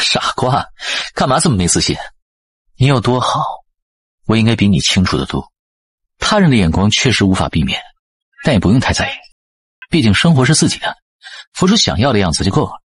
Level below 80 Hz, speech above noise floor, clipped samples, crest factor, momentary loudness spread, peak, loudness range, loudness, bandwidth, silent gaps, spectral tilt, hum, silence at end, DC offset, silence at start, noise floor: -36 dBFS; over 77 dB; under 0.1%; 14 dB; 12 LU; 0 dBFS; 2 LU; -14 LUFS; 11.5 kHz; 2.22-2.65 s, 3.82-4.18 s, 5.59-5.98 s, 7.99-8.32 s, 9.32-9.82 s, 11.02-11.19 s, 11.47-11.52 s; -4.5 dB/octave; none; 0.2 s; 0.4%; 0 s; under -90 dBFS